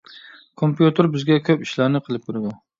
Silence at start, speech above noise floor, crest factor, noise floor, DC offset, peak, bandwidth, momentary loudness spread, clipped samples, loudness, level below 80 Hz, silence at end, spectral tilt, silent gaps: 0.15 s; 26 dB; 20 dB; -45 dBFS; under 0.1%; -2 dBFS; 7.4 kHz; 11 LU; under 0.1%; -20 LUFS; -64 dBFS; 0.25 s; -7.5 dB/octave; none